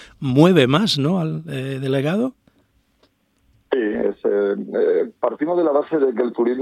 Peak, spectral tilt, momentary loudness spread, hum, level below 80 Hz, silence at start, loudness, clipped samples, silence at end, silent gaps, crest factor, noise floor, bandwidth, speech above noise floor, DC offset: 0 dBFS; -6.5 dB/octave; 10 LU; none; -58 dBFS; 0 s; -19 LUFS; under 0.1%; 0 s; none; 20 dB; -62 dBFS; 13.5 kHz; 43 dB; under 0.1%